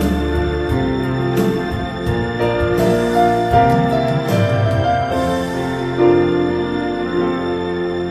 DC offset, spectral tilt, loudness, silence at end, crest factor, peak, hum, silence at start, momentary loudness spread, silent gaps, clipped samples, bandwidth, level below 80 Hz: under 0.1%; -7 dB/octave; -17 LUFS; 0 s; 16 dB; 0 dBFS; none; 0 s; 7 LU; none; under 0.1%; 15 kHz; -32 dBFS